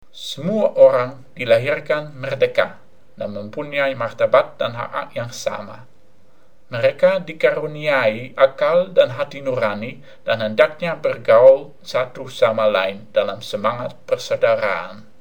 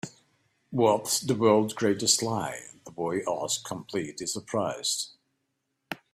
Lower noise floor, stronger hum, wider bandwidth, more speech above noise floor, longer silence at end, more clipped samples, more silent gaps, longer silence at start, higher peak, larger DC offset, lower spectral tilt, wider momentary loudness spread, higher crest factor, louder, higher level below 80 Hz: second, -57 dBFS vs -79 dBFS; neither; first, 19 kHz vs 15.5 kHz; second, 38 dB vs 52 dB; about the same, 0.2 s vs 0.15 s; neither; neither; about the same, 0.15 s vs 0.05 s; first, -2 dBFS vs -8 dBFS; first, 1% vs under 0.1%; first, -5 dB/octave vs -3.5 dB/octave; about the same, 15 LU vs 16 LU; about the same, 18 dB vs 22 dB; first, -19 LUFS vs -27 LUFS; about the same, -66 dBFS vs -68 dBFS